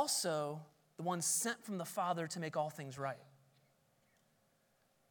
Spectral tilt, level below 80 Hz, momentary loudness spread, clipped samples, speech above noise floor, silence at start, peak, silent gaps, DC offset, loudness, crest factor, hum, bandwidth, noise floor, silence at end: -3 dB/octave; under -90 dBFS; 10 LU; under 0.1%; 36 dB; 0 s; -22 dBFS; none; under 0.1%; -39 LUFS; 20 dB; none; 19 kHz; -76 dBFS; 1.8 s